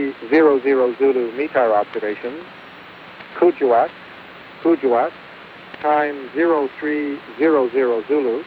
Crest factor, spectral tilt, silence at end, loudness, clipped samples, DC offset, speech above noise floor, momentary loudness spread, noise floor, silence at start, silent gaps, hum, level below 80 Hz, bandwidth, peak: 16 dB; -7.5 dB/octave; 0 s; -18 LUFS; under 0.1%; under 0.1%; 21 dB; 22 LU; -39 dBFS; 0 s; none; none; -66 dBFS; 5 kHz; -2 dBFS